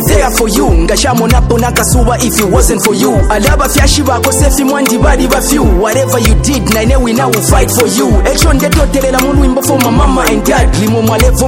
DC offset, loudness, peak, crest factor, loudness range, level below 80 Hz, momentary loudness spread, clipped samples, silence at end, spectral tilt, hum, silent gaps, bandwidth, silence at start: under 0.1%; -9 LUFS; 0 dBFS; 8 dB; 0 LU; -14 dBFS; 1 LU; 0.2%; 0 s; -4.5 dB/octave; none; none; 17 kHz; 0 s